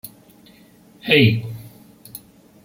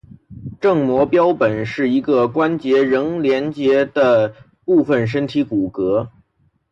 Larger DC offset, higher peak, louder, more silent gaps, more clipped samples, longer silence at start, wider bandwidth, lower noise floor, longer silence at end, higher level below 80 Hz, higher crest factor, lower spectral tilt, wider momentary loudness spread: neither; first, 0 dBFS vs -4 dBFS; about the same, -16 LUFS vs -17 LUFS; neither; neither; second, 0.05 s vs 0.3 s; first, 16.5 kHz vs 7.6 kHz; second, -50 dBFS vs -62 dBFS; second, 0.45 s vs 0.65 s; second, -58 dBFS vs -52 dBFS; first, 22 dB vs 12 dB; second, -6 dB/octave vs -8 dB/octave; first, 25 LU vs 6 LU